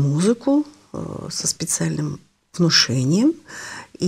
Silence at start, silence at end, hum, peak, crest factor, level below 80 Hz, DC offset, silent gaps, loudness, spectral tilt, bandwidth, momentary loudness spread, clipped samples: 0 s; 0 s; none; -4 dBFS; 18 dB; -56 dBFS; under 0.1%; none; -19 LUFS; -4 dB/octave; 16 kHz; 18 LU; under 0.1%